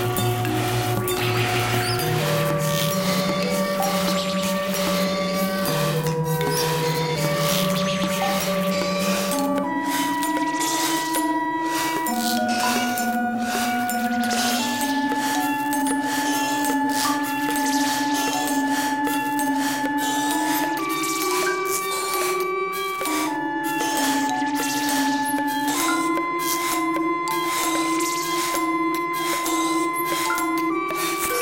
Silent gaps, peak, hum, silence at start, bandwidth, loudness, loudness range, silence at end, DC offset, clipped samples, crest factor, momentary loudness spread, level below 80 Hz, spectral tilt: none; -6 dBFS; none; 0 s; 17 kHz; -22 LUFS; 1 LU; 0 s; 0.1%; under 0.1%; 16 dB; 2 LU; -54 dBFS; -3.5 dB/octave